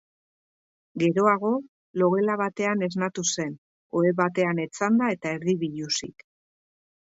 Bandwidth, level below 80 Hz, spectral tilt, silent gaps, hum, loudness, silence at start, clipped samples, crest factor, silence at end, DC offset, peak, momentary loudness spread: 8 kHz; -70 dBFS; -5 dB/octave; 1.68-1.94 s, 3.58-3.90 s; none; -25 LUFS; 0.95 s; under 0.1%; 20 dB; 0.95 s; under 0.1%; -6 dBFS; 9 LU